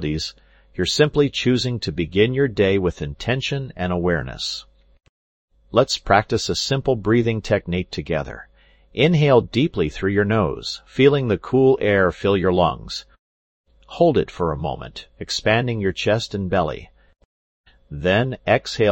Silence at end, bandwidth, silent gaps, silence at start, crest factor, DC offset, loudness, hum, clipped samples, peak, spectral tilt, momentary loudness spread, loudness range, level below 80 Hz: 0 s; 16.5 kHz; 5.09-5.48 s, 13.19-13.64 s, 17.25-17.64 s; 0 s; 20 dB; under 0.1%; -20 LUFS; none; under 0.1%; 0 dBFS; -5.5 dB/octave; 12 LU; 5 LU; -42 dBFS